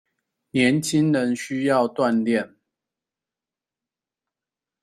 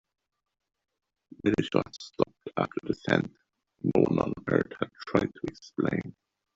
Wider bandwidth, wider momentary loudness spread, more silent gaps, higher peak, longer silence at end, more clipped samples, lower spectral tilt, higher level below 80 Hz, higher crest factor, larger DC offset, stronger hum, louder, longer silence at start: first, 14 kHz vs 7.8 kHz; second, 6 LU vs 11 LU; neither; about the same, -6 dBFS vs -6 dBFS; first, 2.35 s vs 0.45 s; neither; second, -5.5 dB/octave vs -7 dB/octave; about the same, -64 dBFS vs -60 dBFS; second, 18 dB vs 26 dB; neither; neither; first, -22 LUFS vs -30 LUFS; second, 0.55 s vs 1.45 s